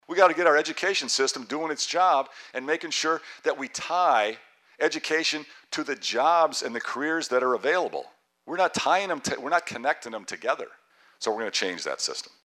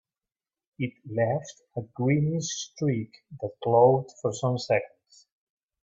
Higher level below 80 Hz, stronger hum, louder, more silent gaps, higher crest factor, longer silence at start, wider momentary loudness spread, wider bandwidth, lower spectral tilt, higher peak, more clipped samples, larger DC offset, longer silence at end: second, -74 dBFS vs -66 dBFS; neither; about the same, -26 LUFS vs -27 LUFS; neither; about the same, 18 dB vs 20 dB; second, 0.1 s vs 0.8 s; second, 11 LU vs 17 LU; first, 14 kHz vs 8 kHz; second, -1.5 dB/octave vs -6 dB/octave; about the same, -8 dBFS vs -8 dBFS; neither; neither; second, 0.2 s vs 0.95 s